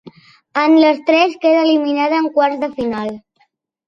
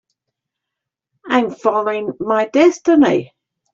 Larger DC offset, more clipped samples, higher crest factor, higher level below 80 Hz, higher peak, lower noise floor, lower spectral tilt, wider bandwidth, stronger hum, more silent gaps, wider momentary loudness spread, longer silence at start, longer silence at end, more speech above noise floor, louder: neither; neither; about the same, 14 dB vs 16 dB; about the same, -60 dBFS vs -60 dBFS; about the same, -2 dBFS vs -2 dBFS; second, -61 dBFS vs -82 dBFS; about the same, -5 dB/octave vs -5.5 dB/octave; second, 6.4 kHz vs 7.6 kHz; neither; neither; first, 12 LU vs 8 LU; second, 0.05 s vs 1.25 s; first, 0.7 s vs 0.5 s; second, 47 dB vs 67 dB; about the same, -15 LUFS vs -16 LUFS